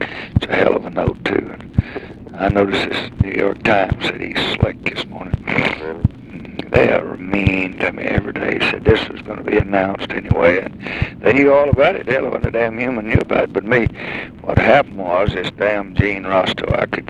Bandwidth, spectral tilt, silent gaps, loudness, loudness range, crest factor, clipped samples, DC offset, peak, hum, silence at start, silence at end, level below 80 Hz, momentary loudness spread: 11.5 kHz; -7 dB/octave; none; -17 LUFS; 3 LU; 18 dB; under 0.1%; under 0.1%; 0 dBFS; none; 0 s; 0 s; -34 dBFS; 9 LU